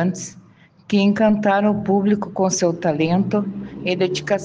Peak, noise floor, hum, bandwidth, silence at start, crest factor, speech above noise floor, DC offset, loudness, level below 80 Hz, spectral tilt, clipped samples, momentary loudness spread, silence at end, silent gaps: -6 dBFS; -50 dBFS; none; 9.4 kHz; 0 s; 14 dB; 32 dB; under 0.1%; -19 LUFS; -56 dBFS; -5.5 dB/octave; under 0.1%; 9 LU; 0 s; none